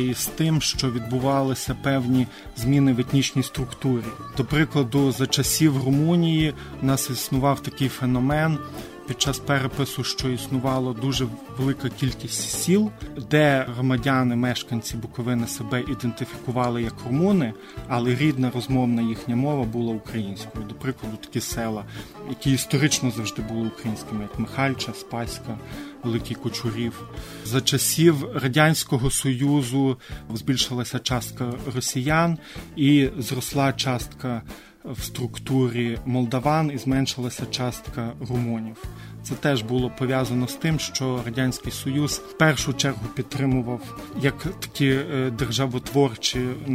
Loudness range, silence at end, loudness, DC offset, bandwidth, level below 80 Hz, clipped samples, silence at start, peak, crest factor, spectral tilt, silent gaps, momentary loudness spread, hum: 5 LU; 0 s; -24 LUFS; under 0.1%; 16 kHz; -44 dBFS; under 0.1%; 0 s; -4 dBFS; 20 dB; -5 dB/octave; none; 11 LU; none